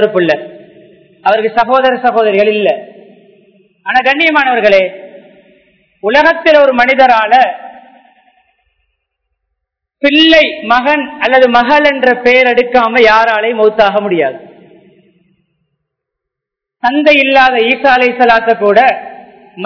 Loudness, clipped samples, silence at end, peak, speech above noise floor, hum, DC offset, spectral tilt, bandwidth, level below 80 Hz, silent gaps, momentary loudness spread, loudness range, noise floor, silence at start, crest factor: -9 LUFS; 2%; 0 s; 0 dBFS; 72 dB; none; under 0.1%; -5 dB/octave; 5.4 kHz; -48 dBFS; none; 8 LU; 6 LU; -80 dBFS; 0 s; 10 dB